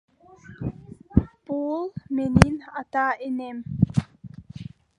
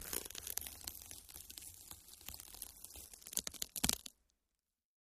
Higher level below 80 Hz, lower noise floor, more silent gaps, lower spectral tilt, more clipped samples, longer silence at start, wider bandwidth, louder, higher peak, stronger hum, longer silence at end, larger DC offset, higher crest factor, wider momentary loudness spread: first, -38 dBFS vs -62 dBFS; second, -48 dBFS vs under -90 dBFS; neither; first, -7 dB/octave vs -1 dB/octave; neither; first, 0.45 s vs 0 s; second, 11 kHz vs 15.5 kHz; first, -25 LUFS vs -44 LUFS; first, 0 dBFS vs -10 dBFS; neither; second, 0.35 s vs 1 s; neither; second, 26 dB vs 38 dB; first, 21 LU vs 15 LU